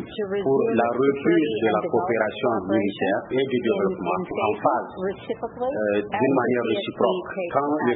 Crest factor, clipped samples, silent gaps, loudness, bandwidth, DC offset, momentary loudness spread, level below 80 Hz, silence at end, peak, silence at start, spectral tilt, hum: 18 dB; under 0.1%; none; -23 LUFS; 4.1 kHz; under 0.1%; 7 LU; -60 dBFS; 0 s; -6 dBFS; 0 s; -11 dB/octave; none